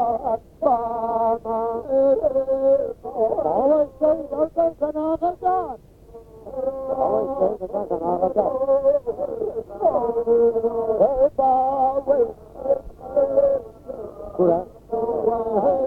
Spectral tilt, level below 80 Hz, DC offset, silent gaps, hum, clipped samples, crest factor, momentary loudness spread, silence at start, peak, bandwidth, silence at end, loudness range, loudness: -9.5 dB/octave; -50 dBFS; under 0.1%; none; none; under 0.1%; 16 dB; 9 LU; 0 s; -6 dBFS; 3.4 kHz; 0 s; 4 LU; -22 LUFS